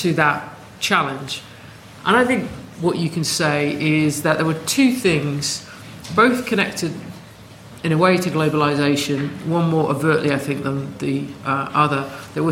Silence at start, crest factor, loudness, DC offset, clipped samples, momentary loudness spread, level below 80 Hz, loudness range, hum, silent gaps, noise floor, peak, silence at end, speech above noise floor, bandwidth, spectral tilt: 0 s; 18 dB; -19 LUFS; under 0.1%; under 0.1%; 12 LU; -54 dBFS; 2 LU; none; none; -41 dBFS; -2 dBFS; 0 s; 22 dB; 16.5 kHz; -5 dB/octave